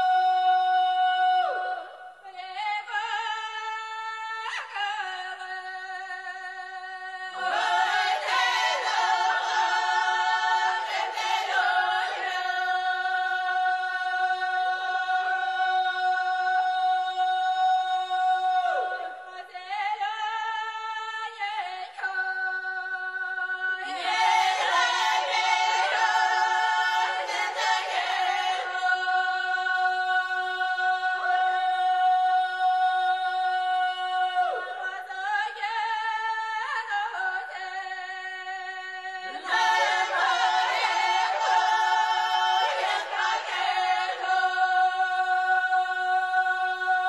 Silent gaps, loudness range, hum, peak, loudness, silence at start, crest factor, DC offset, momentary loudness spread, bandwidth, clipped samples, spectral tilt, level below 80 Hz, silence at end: none; 7 LU; none; -10 dBFS; -26 LUFS; 0 s; 16 dB; under 0.1%; 11 LU; 12 kHz; under 0.1%; 2 dB/octave; -84 dBFS; 0 s